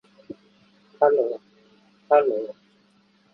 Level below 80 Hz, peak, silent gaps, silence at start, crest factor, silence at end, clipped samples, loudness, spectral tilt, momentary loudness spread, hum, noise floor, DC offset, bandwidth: -78 dBFS; -4 dBFS; none; 1 s; 22 dB; 0.8 s; under 0.1%; -22 LUFS; -7.5 dB/octave; 24 LU; none; -61 dBFS; under 0.1%; 5.4 kHz